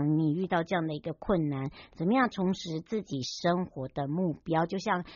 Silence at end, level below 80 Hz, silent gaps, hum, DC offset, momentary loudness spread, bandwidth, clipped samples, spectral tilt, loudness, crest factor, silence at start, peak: 0 s; -56 dBFS; none; none; under 0.1%; 8 LU; 7.2 kHz; under 0.1%; -5.5 dB/octave; -31 LUFS; 18 dB; 0 s; -12 dBFS